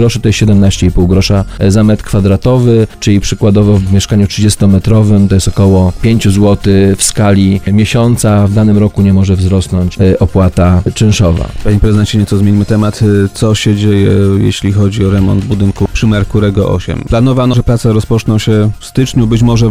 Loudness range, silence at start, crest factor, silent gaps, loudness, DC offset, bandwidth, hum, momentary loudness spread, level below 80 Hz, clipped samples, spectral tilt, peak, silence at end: 2 LU; 0 s; 8 dB; none; -9 LUFS; 2%; 15 kHz; none; 3 LU; -24 dBFS; 0.8%; -6.5 dB/octave; 0 dBFS; 0 s